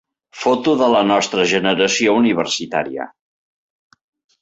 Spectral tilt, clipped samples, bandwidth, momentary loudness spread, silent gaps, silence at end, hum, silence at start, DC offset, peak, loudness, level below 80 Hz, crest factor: -3.5 dB/octave; under 0.1%; 8.2 kHz; 8 LU; none; 1.35 s; none; 0.35 s; under 0.1%; -2 dBFS; -16 LUFS; -60 dBFS; 16 dB